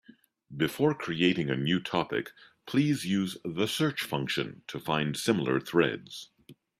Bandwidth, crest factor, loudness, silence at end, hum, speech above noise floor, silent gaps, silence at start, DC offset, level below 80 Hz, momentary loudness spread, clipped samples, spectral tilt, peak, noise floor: 15.5 kHz; 20 dB; -29 LUFS; 0.25 s; none; 26 dB; none; 0.5 s; under 0.1%; -66 dBFS; 12 LU; under 0.1%; -5.5 dB/octave; -10 dBFS; -55 dBFS